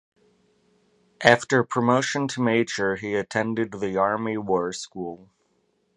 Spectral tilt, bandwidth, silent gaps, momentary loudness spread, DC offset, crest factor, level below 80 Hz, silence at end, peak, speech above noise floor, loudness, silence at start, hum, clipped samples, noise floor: -5 dB/octave; 11 kHz; none; 11 LU; under 0.1%; 26 dB; -62 dBFS; 0.8 s; 0 dBFS; 45 dB; -23 LUFS; 1.2 s; none; under 0.1%; -69 dBFS